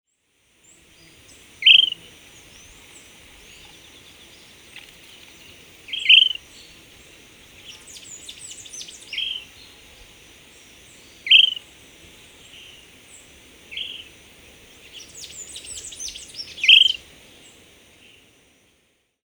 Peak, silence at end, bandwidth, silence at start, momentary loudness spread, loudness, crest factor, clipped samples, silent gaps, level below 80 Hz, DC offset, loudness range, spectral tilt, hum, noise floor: 0 dBFS; 2.3 s; over 20 kHz; 1.6 s; 29 LU; -15 LUFS; 24 dB; under 0.1%; none; -60 dBFS; under 0.1%; 17 LU; 2 dB/octave; none; -66 dBFS